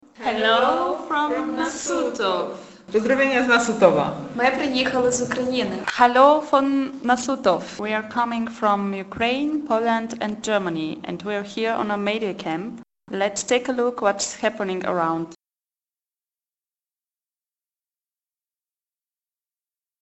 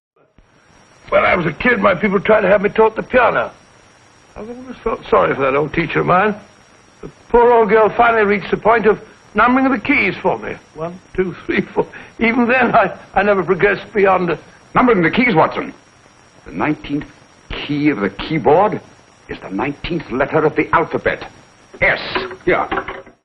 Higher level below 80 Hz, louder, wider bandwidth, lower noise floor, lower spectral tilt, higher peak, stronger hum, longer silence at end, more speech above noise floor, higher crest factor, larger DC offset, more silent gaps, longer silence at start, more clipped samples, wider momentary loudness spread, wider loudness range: second, -60 dBFS vs -42 dBFS; second, -22 LUFS vs -15 LUFS; first, 8.4 kHz vs 7.2 kHz; first, under -90 dBFS vs -51 dBFS; second, -4 dB/octave vs -7.5 dB/octave; about the same, 0 dBFS vs 0 dBFS; neither; first, 4.7 s vs 0.15 s; first, over 69 dB vs 36 dB; first, 22 dB vs 16 dB; neither; neither; second, 0.2 s vs 1.05 s; neither; second, 10 LU vs 14 LU; about the same, 7 LU vs 5 LU